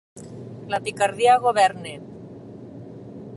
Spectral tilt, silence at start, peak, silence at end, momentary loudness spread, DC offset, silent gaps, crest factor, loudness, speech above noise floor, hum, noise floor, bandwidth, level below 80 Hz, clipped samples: -4 dB/octave; 0.15 s; -6 dBFS; 0 s; 23 LU; under 0.1%; none; 18 dB; -20 LUFS; 20 dB; none; -40 dBFS; 11.5 kHz; -62 dBFS; under 0.1%